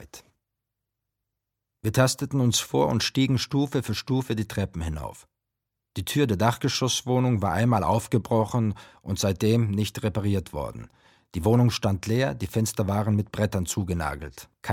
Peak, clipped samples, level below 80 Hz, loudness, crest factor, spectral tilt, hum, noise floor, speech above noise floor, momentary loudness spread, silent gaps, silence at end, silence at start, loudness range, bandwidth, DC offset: -4 dBFS; under 0.1%; -48 dBFS; -25 LUFS; 20 dB; -5.5 dB/octave; none; -84 dBFS; 59 dB; 11 LU; none; 0 s; 0 s; 3 LU; 16.5 kHz; under 0.1%